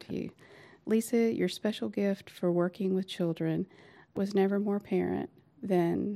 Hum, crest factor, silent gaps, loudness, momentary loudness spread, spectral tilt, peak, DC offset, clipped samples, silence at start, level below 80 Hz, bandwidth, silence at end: none; 14 dB; none; -31 LUFS; 13 LU; -7 dB/octave; -16 dBFS; under 0.1%; under 0.1%; 0 s; -70 dBFS; 15 kHz; 0 s